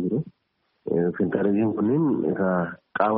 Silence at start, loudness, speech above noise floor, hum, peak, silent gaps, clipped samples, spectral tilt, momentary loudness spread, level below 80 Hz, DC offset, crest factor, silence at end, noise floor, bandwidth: 0 s; -24 LUFS; 50 dB; none; -6 dBFS; none; under 0.1%; -8.5 dB/octave; 8 LU; -62 dBFS; under 0.1%; 18 dB; 0 s; -72 dBFS; 4.7 kHz